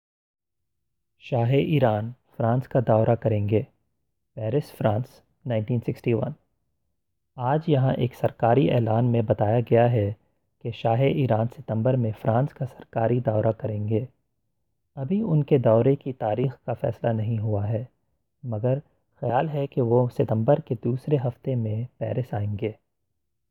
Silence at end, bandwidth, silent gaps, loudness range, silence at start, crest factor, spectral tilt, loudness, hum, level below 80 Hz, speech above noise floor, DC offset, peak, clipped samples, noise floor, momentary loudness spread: 0.75 s; 4.7 kHz; none; 5 LU; 1.25 s; 18 dB; -10 dB/octave; -24 LUFS; none; -60 dBFS; 59 dB; under 0.1%; -6 dBFS; under 0.1%; -82 dBFS; 11 LU